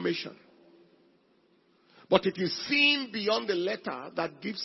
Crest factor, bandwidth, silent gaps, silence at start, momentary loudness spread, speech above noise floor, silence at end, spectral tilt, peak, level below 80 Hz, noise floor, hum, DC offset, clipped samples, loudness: 24 dB; 6 kHz; none; 0 s; 13 LU; 37 dB; 0 s; -5 dB/octave; -6 dBFS; -70 dBFS; -66 dBFS; none; under 0.1%; under 0.1%; -28 LUFS